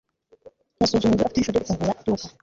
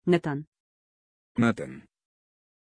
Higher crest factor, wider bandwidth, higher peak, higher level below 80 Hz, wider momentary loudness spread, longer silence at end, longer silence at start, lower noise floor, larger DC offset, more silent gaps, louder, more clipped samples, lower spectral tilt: second, 16 dB vs 22 dB; second, 7.8 kHz vs 10.5 kHz; about the same, -8 dBFS vs -10 dBFS; first, -46 dBFS vs -64 dBFS; second, 6 LU vs 14 LU; second, 0.1 s vs 0.95 s; first, 0.8 s vs 0.05 s; second, -52 dBFS vs under -90 dBFS; neither; second, none vs 0.47-0.52 s, 0.60-1.35 s; first, -23 LUFS vs -28 LUFS; neither; second, -5.5 dB/octave vs -7.5 dB/octave